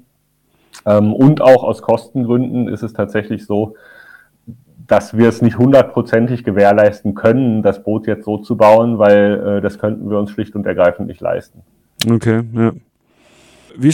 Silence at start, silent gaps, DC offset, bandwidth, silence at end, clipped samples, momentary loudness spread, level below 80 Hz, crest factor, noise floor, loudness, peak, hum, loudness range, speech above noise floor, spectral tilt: 0.75 s; none; under 0.1%; 16.5 kHz; 0 s; under 0.1%; 11 LU; -52 dBFS; 14 dB; -61 dBFS; -14 LUFS; 0 dBFS; none; 6 LU; 48 dB; -7.5 dB/octave